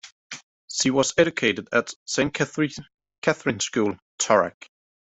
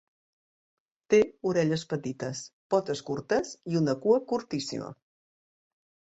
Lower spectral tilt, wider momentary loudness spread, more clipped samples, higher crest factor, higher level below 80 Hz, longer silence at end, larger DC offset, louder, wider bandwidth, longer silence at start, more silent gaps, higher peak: second, -3.5 dB/octave vs -5.5 dB/octave; first, 16 LU vs 11 LU; neither; about the same, 22 dB vs 20 dB; first, -60 dBFS vs -68 dBFS; second, 0.65 s vs 1.2 s; neither; first, -23 LUFS vs -29 LUFS; about the same, 8.2 kHz vs 8.2 kHz; second, 0.05 s vs 1.1 s; first, 0.12-0.30 s, 0.43-0.68 s, 1.96-2.06 s, 2.94-2.98 s, 3.18-3.22 s, 4.02-4.18 s vs 2.53-2.70 s; first, -4 dBFS vs -10 dBFS